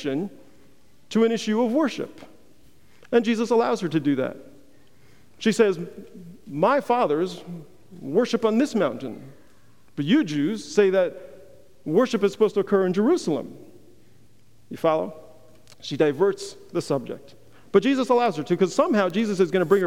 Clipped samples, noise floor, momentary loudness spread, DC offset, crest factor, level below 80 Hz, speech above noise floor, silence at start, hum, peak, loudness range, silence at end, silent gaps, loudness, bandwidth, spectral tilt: under 0.1%; -58 dBFS; 17 LU; 0.4%; 20 dB; -68 dBFS; 36 dB; 0 s; none; -4 dBFS; 4 LU; 0 s; none; -23 LUFS; 15.5 kHz; -6 dB/octave